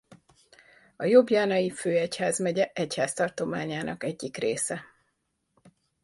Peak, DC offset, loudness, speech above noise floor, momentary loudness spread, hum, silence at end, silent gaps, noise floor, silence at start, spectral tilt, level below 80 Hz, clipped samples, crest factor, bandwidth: -6 dBFS; under 0.1%; -27 LUFS; 50 dB; 11 LU; none; 1.2 s; none; -77 dBFS; 0.1 s; -4.5 dB/octave; -68 dBFS; under 0.1%; 22 dB; 11.5 kHz